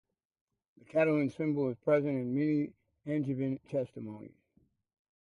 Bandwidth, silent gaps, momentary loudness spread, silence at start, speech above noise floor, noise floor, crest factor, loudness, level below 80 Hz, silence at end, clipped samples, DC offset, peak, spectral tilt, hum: 10 kHz; none; 14 LU; 0.95 s; 40 dB; -72 dBFS; 18 dB; -32 LUFS; -74 dBFS; 0.95 s; under 0.1%; under 0.1%; -16 dBFS; -9.5 dB/octave; none